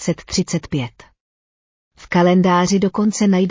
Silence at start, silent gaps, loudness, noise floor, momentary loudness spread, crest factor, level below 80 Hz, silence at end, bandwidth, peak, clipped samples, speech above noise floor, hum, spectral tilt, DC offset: 0 s; 1.21-1.91 s; -17 LUFS; under -90 dBFS; 11 LU; 14 dB; -48 dBFS; 0 s; 7.6 kHz; -4 dBFS; under 0.1%; over 74 dB; none; -5.5 dB/octave; under 0.1%